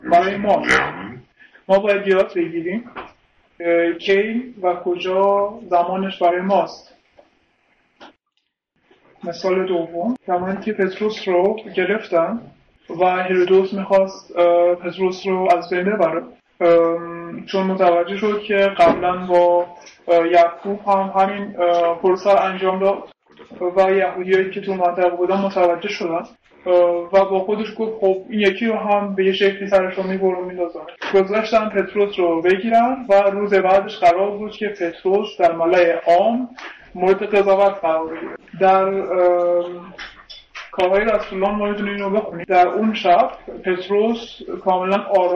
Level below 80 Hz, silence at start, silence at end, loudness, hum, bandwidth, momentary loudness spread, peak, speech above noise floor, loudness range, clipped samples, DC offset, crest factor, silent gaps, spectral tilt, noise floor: -54 dBFS; 0.05 s; 0 s; -18 LUFS; none; 7.8 kHz; 11 LU; -4 dBFS; 54 dB; 4 LU; under 0.1%; under 0.1%; 14 dB; none; -6.5 dB/octave; -72 dBFS